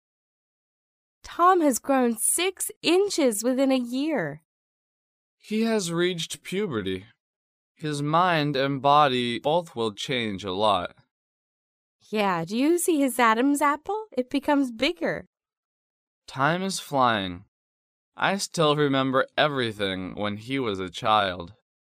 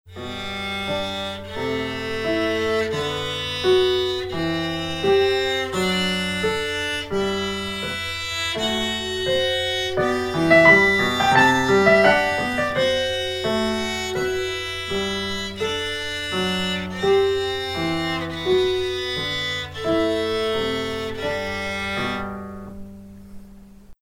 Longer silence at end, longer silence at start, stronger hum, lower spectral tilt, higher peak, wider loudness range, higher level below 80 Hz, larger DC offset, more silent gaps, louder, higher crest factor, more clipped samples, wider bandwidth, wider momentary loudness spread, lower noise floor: first, 0.45 s vs 0.1 s; first, 1.25 s vs 0.05 s; neither; about the same, -4 dB/octave vs -4 dB/octave; second, -6 dBFS vs -2 dBFS; second, 5 LU vs 8 LU; second, -64 dBFS vs -46 dBFS; neither; first, 2.76-2.81 s, 4.45-5.38 s, 7.20-7.75 s, 11.11-11.99 s, 15.27-15.33 s, 15.57-16.22 s, 17.48-18.12 s vs none; second, -24 LUFS vs -21 LUFS; about the same, 20 dB vs 20 dB; neither; about the same, 15.5 kHz vs 16 kHz; about the same, 10 LU vs 11 LU; first, under -90 dBFS vs -44 dBFS